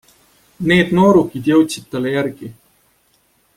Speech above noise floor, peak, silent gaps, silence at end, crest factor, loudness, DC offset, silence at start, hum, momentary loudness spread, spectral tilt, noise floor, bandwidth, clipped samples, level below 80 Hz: 44 dB; -2 dBFS; none; 1.05 s; 16 dB; -15 LUFS; under 0.1%; 0.6 s; none; 13 LU; -6 dB/octave; -59 dBFS; 16 kHz; under 0.1%; -50 dBFS